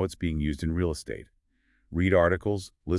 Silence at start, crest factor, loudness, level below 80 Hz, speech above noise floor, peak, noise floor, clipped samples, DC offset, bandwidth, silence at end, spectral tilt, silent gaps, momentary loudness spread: 0 s; 18 dB; -27 LUFS; -44 dBFS; 42 dB; -10 dBFS; -69 dBFS; under 0.1%; under 0.1%; 12 kHz; 0 s; -7 dB/octave; none; 13 LU